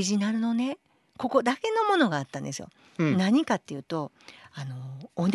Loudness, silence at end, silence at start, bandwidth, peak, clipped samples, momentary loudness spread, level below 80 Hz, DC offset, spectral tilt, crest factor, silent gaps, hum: -27 LUFS; 0 s; 0 s; 12 kHz; -8 dBFS; under 0.1%; 16 LU; -70 dBFS; under 0.1%; -5.5 dB/octave; 20 dB; none; none